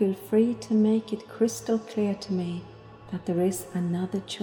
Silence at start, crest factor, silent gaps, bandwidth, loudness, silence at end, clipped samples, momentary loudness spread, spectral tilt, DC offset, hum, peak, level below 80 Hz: 0 s; 16 dB; none; 19.5 kHz; -27 LUFS; 0 s; under 0.1%; 11 LU; -6.5 dB/octave; under 0.1%; none; -10 dBFS; -62 dBFS